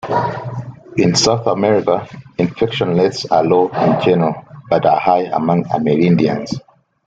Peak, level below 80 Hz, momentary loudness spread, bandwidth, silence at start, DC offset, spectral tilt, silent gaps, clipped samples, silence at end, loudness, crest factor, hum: 0 dBFS; -50 dBFS; 12 LU; 9.2 kHz; 0.05 s; under 0.1%; -5.5 dB/octave; none; under 0.1%; 0.45 s; -15 LUFS; 14 dB; none